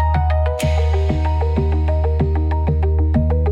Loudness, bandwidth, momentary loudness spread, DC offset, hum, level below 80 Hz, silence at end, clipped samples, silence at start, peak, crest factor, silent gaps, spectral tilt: -18 LUFS; 9.4 kHz; 2 LU; under 0.1%; none; -20 dBFS; 0 s; under 0.1%; 0 s; -6 dBFS; 10 dB; none; -8 dB/octave